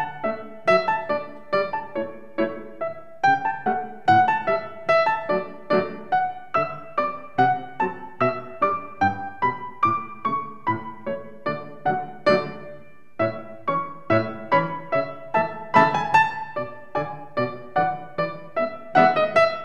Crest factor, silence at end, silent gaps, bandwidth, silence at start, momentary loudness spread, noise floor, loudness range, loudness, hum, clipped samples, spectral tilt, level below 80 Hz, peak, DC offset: 22 dB; 0 s; none; 9.4 kHz; 0 s; 11 LU; -46 dBFS; 4 LU; -24 LUFS; none; under 0.1%; -6.5 dB/octave; -66 dBFS; -2 dBFS; 0.9%